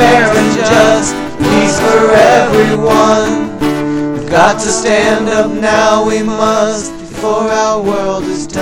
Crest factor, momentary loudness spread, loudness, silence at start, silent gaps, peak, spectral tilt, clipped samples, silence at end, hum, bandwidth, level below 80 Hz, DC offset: 10 dB; 8 LU; -10 LUFS; 0 s; none; 0 dBFS; -4 dB/octave; 0.4%; 0 s; none; 17.5 kHz; -36 dBFS; under 0.1%